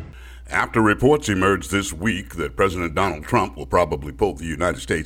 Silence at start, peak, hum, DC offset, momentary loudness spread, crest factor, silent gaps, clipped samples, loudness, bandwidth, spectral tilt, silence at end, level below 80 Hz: 0 s; -6 dBFS; none; under 0.1%; 7 LU; 16 dB; none; under 0.1%; -21 LUFS; 17 kHz; -5 dB/octave; 0 s; -38 dBFS